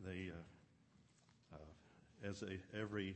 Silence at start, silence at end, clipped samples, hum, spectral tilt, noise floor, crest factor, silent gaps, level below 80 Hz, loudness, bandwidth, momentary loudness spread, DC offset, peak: 0 s; 0 s; under 0.1%; none; -6 dB/octave; -72 dBFS; 20 dB; none; -72 dBFS; -50 LUFS; 8.4 kHz; 17 LU; under 0.1%; -30 dBFS